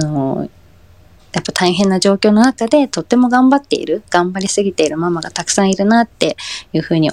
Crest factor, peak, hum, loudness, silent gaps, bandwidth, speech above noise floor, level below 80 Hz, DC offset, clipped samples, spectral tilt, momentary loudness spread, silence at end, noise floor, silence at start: 14 dB; 0 dBFS; none; -14 LUFS; none; 12.5 kHz; 32 dB; -50 dBFS; 0.2%; under 0.1%; -4.5 dB/octave; 9 LU; 0 s; -45 dBFS; 0 s